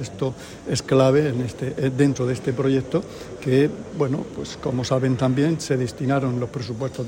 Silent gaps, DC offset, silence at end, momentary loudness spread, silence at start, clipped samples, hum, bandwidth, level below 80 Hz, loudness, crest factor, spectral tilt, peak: none; under 0.1%; 0 s; 10 LU; 0 s; under 0.1%; none; 16 kHz; -50 dBFS; -23 LUFS; 18 dB; -6.5 dB/octave; -6 dBFS